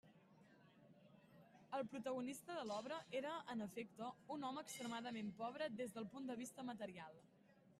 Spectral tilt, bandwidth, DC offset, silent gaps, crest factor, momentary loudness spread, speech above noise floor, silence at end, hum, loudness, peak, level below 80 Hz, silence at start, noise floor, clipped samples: -4.5 dB/octave; 13.5 kHz; under 0.1%; none; 16 dB; 21 LU; 20 dB; 0.05 s; none; -49 LUFS; -34 dBFS; -88 dBFS; 0.05 s; -70 dBFS; under 0.1%